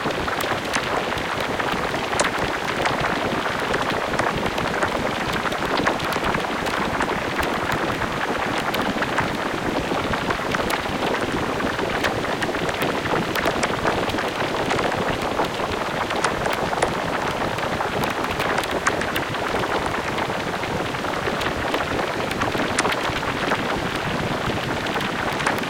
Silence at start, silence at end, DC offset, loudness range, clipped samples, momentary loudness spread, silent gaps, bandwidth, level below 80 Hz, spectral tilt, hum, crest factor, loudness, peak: 0 s; 0 s; under 0.1%; 1 LU; under 0.1%; 2 LU; none; 17 kHz; -42 dBFS; -4 dB/octave; none; 20 dB; -23 LUFS; -4 dBFS